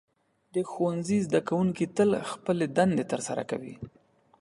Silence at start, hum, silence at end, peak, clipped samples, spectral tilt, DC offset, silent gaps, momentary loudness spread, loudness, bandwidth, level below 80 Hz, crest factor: 0.55 s; none; 0.5 s; -10 dBFS; under 0.1%; -6 dB/octave; under 0.1%; none; 11 LU; -28 LUFS; 11.5 kHz; -64 dBFS; 18 dB